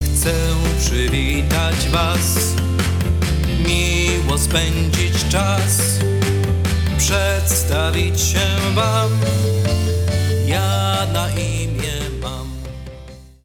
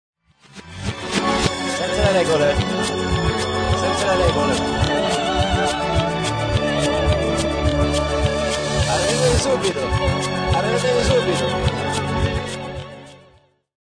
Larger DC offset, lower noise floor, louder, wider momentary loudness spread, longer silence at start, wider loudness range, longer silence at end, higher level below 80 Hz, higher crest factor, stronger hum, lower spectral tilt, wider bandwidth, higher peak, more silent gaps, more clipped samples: neither; second, -38 dBFS vs -54 dBFS; about the same, -18 LUFS vs -19 LUFS; about the same, 6 LU vs 6 LU; second, 0 s vs 0.55 s; about the same, 2 LU vs 2 LU; second, 0.15 s vs 0.75 s; first, -24 dBFS vs -30 dBFS; about the same, 16 dB vs 16 dB; neither; about the same, -4.5 dB/octave vs -4.5 dB/octave; first, 18.5 kHz vs 10 kHz; about the same, -2 dBFS vs -2 dBFS; neither; neither